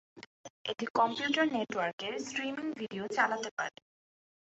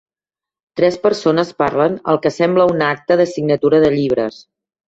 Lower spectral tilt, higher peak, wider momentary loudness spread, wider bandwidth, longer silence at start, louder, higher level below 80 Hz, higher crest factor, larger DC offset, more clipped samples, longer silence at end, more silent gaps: second, -1.5 dB/octave vs -6.5 dB/octave; second, -14 dBFS vs -2 dBFS; first, 10 LU vs 5 LU; about the same, 8 kHz vs 8 kHz; second, 0.15 s vs 0.75 s; second, -33 LUFS vs -15 LUFS; second, -80 dBFS vs -54 dBFS; first, 22 dB vs 14 dB; neither; neither; first, 0.8 s vs 0.55 s; first, 0.26-0.44 s, 0.50-0.65 s, 0.90-0.95 s, 1.93-1.98 s, 3.51-3.57 s vs none